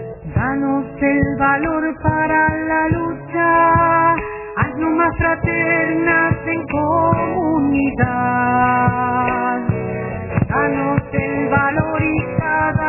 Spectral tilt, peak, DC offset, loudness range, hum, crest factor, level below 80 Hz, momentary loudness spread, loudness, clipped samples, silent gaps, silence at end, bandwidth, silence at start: -11.5 dB/octave; 0 dBFS; under 0.1%; 3 LU; none; 16 dB; -36 dBFS; 7 LU; -17 LUFS; under 0.1%; none; 0 s; 2.9 kHz; 0 s